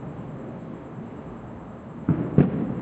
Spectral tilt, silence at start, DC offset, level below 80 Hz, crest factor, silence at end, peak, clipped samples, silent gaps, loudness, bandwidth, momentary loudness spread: -11 dB/octave; 0 s; under 0.1%; -50 dBFS; 24 dB; 0 s; -2 dBFS; under 0.1%; none; -27 LUFS; 4 kHz; 18 LU